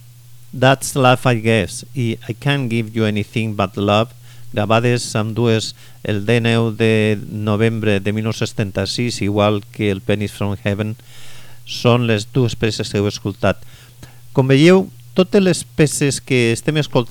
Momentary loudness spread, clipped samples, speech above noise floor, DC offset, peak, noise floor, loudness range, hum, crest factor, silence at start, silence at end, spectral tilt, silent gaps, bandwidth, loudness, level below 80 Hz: 8 LU; under 0.1%; 23 dB; under 0.1%; -2 dBFS; -40 dBFS; 4 LU; none; 16 dB; 0.05 s; 0 s; -5.5 dB/octave; none; 18.5 kHz; -17 LUFS; -48 dBFS